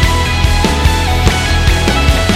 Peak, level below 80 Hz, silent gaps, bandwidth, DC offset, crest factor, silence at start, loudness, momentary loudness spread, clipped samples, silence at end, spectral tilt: 0 dBFS; -16 dBFS; none; 16 kHz; under 0.1%; 10 dB; 0 s; -12 LUFS; 1 LU; under 0.1%; 0 s; -4.5 dB/octave